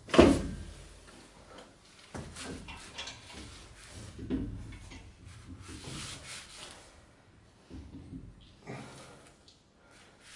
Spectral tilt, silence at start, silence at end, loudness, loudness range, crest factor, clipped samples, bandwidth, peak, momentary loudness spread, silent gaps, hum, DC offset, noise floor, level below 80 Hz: -5.5 dB/octave; 0.05 s; 0 s; -35 LUFS; 8 LU; 32 dB; under 0.1%; 11.5 kHz; -4 dBFS; 17 LU; none; none; under 0.1%; -61 dBFS; -50 dBFS